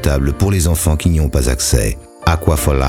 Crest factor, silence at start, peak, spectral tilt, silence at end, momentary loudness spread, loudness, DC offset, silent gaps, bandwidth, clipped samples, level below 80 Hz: 14 dB; 0 s; 0 dBFS; -5 dB/octave; 0 s; 3 LU; -15 LUFS; under 0.1%; none; 17 kHz; under 0.1%; -18 dBFS